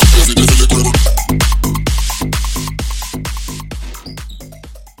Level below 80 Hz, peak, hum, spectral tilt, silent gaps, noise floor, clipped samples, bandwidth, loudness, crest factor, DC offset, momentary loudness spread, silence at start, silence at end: -16 dBFS; 0 dBFS; none; -4 dB/octave; none; -34 dBFS; under 0.1%; 17 kHz; -14 LUFS; 12 dB; under 0.1%; 20 LU; 0 s; 0.15 s